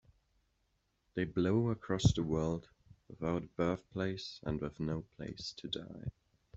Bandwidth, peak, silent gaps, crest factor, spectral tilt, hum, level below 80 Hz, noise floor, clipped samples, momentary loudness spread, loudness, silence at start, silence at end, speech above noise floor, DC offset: 8.2 kHz; -14 dBFS; none; 24 dB; -6.5 dB/octave; none; -56 dBFS; -79 dBFS; under 0.1%; 12 LU; -37 LUFS; 1.15 s; 0.45 s; 43 dB; under 0.1%